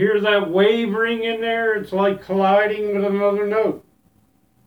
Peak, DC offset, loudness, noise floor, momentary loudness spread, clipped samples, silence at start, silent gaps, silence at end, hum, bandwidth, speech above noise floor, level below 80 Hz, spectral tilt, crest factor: -4 dBFS; under 0.1%; -19 LUFS; -60 dBFS; 5 LU; under 0.1%; 0 s; none; 0.9 s; none; 6.2 kHz; 41 dB; -60 dBFS; -7 dB/octave; 14 dB